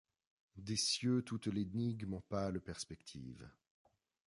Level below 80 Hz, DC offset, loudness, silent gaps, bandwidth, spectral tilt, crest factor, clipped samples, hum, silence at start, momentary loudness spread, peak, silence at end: -64 dBFS; under 0.1%; -40 LUFS; none; 11.5 kHz; -4.5 dB/octave; 18 dB; under 0.1%; none; 0.55 s; 16 LU; -24 dBFS; 0.75 s